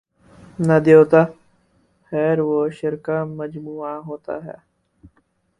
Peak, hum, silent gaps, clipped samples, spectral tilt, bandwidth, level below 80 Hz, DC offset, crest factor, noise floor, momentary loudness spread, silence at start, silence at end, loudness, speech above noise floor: 0 dBFS; none; none; under 0.1%; -8.5 dB/octave; 10 kHz; -60 dBFS; under 0.1%; 20 dB; -64 dBFS; 19 LU; 0.6 s; 1.1 s; -18 LUFS; 46 dB